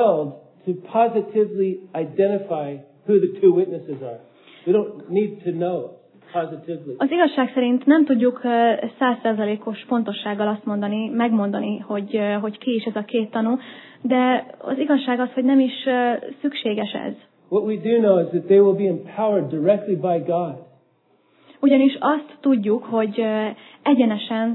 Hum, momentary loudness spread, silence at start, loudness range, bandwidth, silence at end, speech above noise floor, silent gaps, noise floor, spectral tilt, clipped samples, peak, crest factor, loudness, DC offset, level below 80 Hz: none; 12 LU; 0 s; 4 LU; 4.2 kHz; 0 s; 41 dB; none; -61 dBFS; -10.5 dB/octave; under 0.1%; -4 dBFS; 18 dB; -21 LUFS; under 0.1%; -86 dBFS